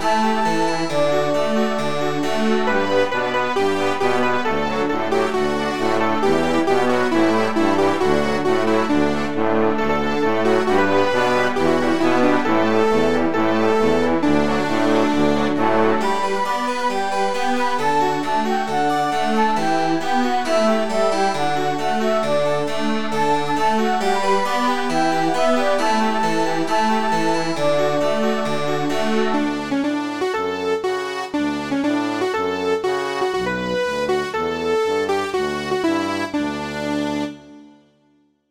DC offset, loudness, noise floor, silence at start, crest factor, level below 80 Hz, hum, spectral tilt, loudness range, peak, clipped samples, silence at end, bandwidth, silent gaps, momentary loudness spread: 5%; -19 LUFS; -60 dBFS; 0 s; 14 dB; -50 dBFS; none; -5 dB/octave; 4 LU; -4 dBFS; under 0.1%; 0 s; 17.5 kHz; none; 5 LU